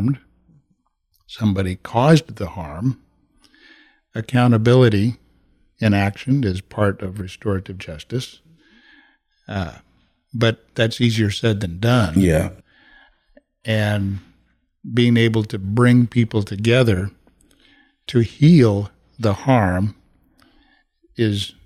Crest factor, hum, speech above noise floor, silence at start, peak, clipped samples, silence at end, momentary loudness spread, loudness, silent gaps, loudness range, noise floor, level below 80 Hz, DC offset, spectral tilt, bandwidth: 16 dB; none; 49 dB; 0 s; -2 dBFS; under 0.1%; 0.15 s; 17 LU; -19 LUFS; none; 7 LU; -67 dBFS; -48 dBFS; under 0.1%; -7 dB/octave; 13.5 kHz